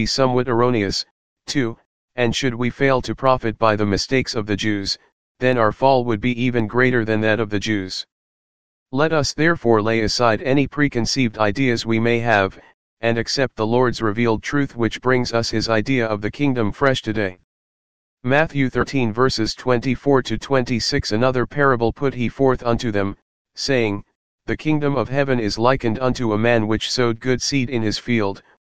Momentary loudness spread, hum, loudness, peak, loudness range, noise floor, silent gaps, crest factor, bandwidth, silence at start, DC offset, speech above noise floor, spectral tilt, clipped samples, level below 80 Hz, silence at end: 6 LU; none; -20 LUFS; 0 dBFS; 2 LU; under -90 dBFS; 1.11-1.36 s, 1.86-2.08 s, 5.12-5.35 s, 8.12-8.86 s, 12.74-12.97 s, 17.44-18.17 s, 23.22-23.45 s, 24.15-24.38 s; 18 dB; 9.8 kHz; 0 s; 2%; over 71 dB; -5.5 dB/octave; under 0.1%; -42 dBFS; 0.05 s